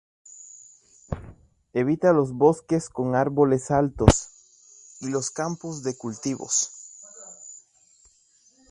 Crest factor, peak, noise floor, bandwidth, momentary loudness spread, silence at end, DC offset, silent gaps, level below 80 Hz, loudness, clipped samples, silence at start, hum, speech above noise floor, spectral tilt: 26 dB; 0 dBFS; -61 dBFS; 11.5 kHz; 22 LU; 1.15 s; under 0.1%; none; -40 dBFS; -24 LUFS; under 0.1%; 0.55 s; none; 38 dB; -5.5 dB/octave